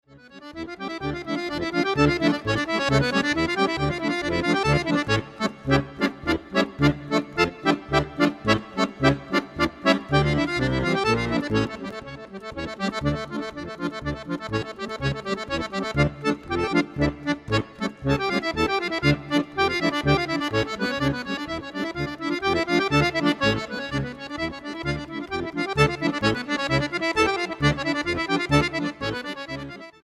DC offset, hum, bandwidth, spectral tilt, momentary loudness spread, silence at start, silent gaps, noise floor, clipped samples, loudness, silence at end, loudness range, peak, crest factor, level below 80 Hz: under 0.1%; none; 13 kHz; -5.5 dB/octave; 10 LU; 0.1 s; none; -45 dBFS; under 0.1%; -24 LUFS; 0.15 s; 4 LU; -4 dBFS; 20 dB; -42 dBFS